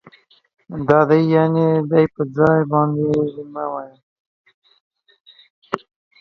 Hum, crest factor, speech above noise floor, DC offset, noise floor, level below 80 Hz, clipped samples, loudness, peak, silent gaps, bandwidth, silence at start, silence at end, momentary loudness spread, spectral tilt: none; 20 dB; 33 dB; under 0.1%; -50 dBFS; -56 dBFS; under 0.1%; -18 LUFS; 0 dBFS; 4.03-4.45 s, 4.54-4.62 s, 4.81-4.91 s, 5.21-5.25 s, 5.50-5.62 s; 6.4 kHz; 0.7 s; 0.45 s; 15 LU; -9.5 dB/octave